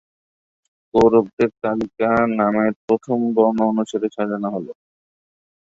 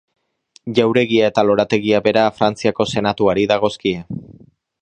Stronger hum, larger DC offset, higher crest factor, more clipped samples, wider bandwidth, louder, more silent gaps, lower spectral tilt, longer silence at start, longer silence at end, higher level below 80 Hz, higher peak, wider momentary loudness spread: neither; neither; about the same, 18 dB vs 18 dB; neither; second, 7.8 kHz vs 9.4 kHz; about the same, -19 LUFS vs -17 LUFS; first, 1.33-1.37 s, 2.76-2.88 s vs none; first, -7.5 dB/octave vs -5.5 dB/octave; first, 0.95 s vs 0.65 s; first, 0.95 s vs 0.5 s; about the same, -54 dBFS vs -52 dBFS; about the same, -2 dBFS vs 0 dBFS; about the same, 8 LU vs 8 LU